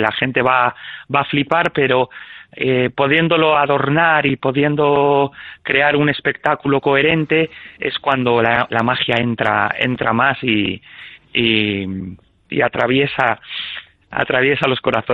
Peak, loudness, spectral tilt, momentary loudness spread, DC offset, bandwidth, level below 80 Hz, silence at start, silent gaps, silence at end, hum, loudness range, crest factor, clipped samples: 0 dBFS; -16 LUFS; -7.5 dB/octave; 11 LU; under 0.1%; 7.4 kHz; -52 dBFS; 0 s; none; 0 s; none; 3 LU; 16 dB; under 0.1%